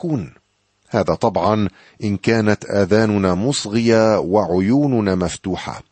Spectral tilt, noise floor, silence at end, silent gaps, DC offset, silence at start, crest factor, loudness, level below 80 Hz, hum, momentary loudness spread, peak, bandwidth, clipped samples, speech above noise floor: -6 dB/octave; -63 dBFS; 0.1 s; none; under 0.1%; 0.05 s; 16 dB; -18 LUFS; -48 dBFS; none; 10 LU; -2 dBFS; 8.8 kHz; under 0.1%; 45 dB